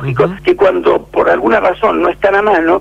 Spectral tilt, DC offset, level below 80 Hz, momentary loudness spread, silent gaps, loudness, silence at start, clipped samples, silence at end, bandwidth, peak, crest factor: -7.5 dB/octave; under 0.1%; -40 dBFS; 3 LU; none; -12 LUFS; 0 s; under 0.1%; 0 s; 8 kHz; -2 dBFS; 10 dB